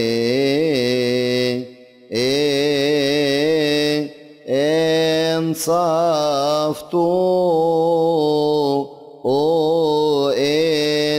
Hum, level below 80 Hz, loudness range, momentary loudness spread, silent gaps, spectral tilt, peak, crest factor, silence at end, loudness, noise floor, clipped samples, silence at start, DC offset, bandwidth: none; -58 dBFS; 1 LU; 5 LU; none; -5 dB/octave; -8 dBFS; 10 dB; 0 s; -18 LUFS; -39 dBFS; under 0.1%; 0 s; under 0.1%; 16 kHz